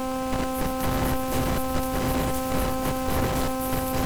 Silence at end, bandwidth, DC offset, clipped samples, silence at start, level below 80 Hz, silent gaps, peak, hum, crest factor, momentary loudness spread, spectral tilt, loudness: 0 s; over 20 kHz; under 0.1%; under 0.1%; 0 s; -34 dBFS; none; -12 dBFS; none; 12 dB; 2 LU; -5 dB/octave; -26 LUFS